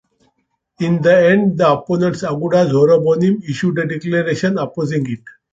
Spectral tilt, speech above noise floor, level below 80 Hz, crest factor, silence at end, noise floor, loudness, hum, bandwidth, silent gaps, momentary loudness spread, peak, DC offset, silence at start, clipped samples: -7.5 dB/octave; 52 dB; -54 dBFS; 14 dB; 0.25 s; -67 dBFS; -15 LUFS; none; 7.8 kHz; none; 9 LU; -2 dBFS; under 0.1%; 0.8 s; under 0.1%